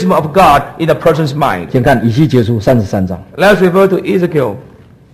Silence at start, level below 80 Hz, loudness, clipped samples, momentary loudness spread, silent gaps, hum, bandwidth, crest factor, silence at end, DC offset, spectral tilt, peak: 0 s; -34 dBFS; -11 LUFS; 0.2%; 8 LU; none; none; 14.5 kHz; 10 dB; 0.55 s; under 0.1%; -7 dB/octave; 0 dBFS